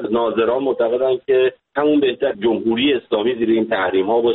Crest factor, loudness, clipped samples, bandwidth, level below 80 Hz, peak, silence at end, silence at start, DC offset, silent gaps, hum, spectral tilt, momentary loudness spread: 12 dB; -18 LUFS; under 0.1%; 4.1 kHz; -56 dBFS; -6 dBFS; 0 s; 0 s; under 0.1%; none; none; -3 dB/octave; 3 LU